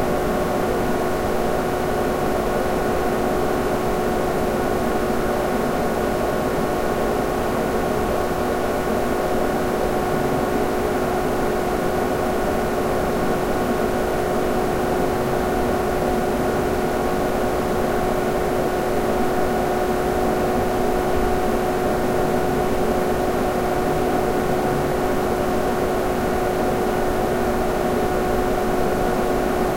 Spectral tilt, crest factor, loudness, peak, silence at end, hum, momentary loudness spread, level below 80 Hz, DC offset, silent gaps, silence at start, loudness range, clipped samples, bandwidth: -5.5 dB/octave; 14 dB; -21 LUFS; -8 dBFS; 0 s; none; 1 LU; -32 dBFS; under 0.1%; none; 0 s; 1 LU; under 0.1%; 16 kHz